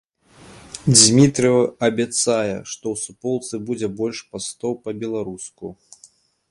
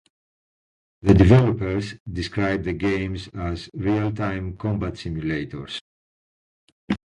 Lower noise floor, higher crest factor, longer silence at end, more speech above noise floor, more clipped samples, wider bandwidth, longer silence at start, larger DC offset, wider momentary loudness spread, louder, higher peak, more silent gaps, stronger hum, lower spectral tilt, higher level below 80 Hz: second, -53 dBFS vs under -90 dBFS; about the same, 20 dB vs 22 dB; first, 0.75 s vs 0.25 s; second, 33 dB vs over 69 dB; neither; about the same, 11.5 kHz vs 10.5 kHz; second, 0.5 s vs 1.05 s; neither; first, 19 LU vs 15 LU; first, -19 LUFS vs -23 LUFS; about the same, 0 dBFS vs 0 dBFS; second, none vs 2.00-2.06 s, 5.81-6.88 s; neither; second, -4 dB/octave vs -8 dB/octave; second, -56 dBFS vs -36 dBFS